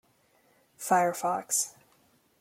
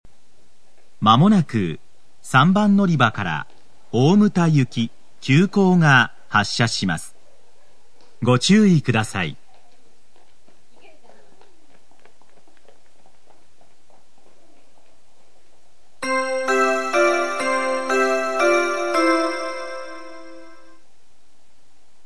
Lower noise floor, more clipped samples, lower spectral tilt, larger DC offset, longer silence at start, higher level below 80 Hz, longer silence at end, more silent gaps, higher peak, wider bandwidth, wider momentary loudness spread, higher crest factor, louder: first, -66 dBFS vs -61 dBFS; neither; second, -2.5 dB/octave vs -5.5 dB/octave; second, under 0.1% vs 2%; second, 0.8 s vs 1 s; second, -80 dBFS vs -62 dBFS; second, 0.7 s vs 1.65 s; neither; second, -10 dBFS vs 0 dBFS; first, 16.5 kHz vs 11 kHz; second, 10 LU vs 15 LU; about the same, 22 dB vs 22 dB; second, -28 LUFS vs -18 LUFS